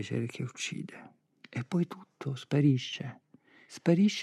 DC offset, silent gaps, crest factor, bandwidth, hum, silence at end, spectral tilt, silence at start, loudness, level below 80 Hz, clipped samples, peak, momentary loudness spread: under 0.1%; none; 20 dB; 11.5 kHz; none; 0 s; -6 dB/octave; 0 s; -32 LUFS; -84 dBFS; under 0.1%; -12 dBFS; 17 LU